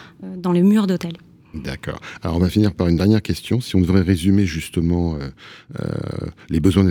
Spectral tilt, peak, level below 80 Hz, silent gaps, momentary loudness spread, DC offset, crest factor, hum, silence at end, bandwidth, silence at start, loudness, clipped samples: -7.5 dB/octave; -2 dBFS; -38 dBFS; none; 15 LU; under 0.1%; 16 dB; none; 0 s; 17 kHz; 0 s; -19 LUFS; under 0.1%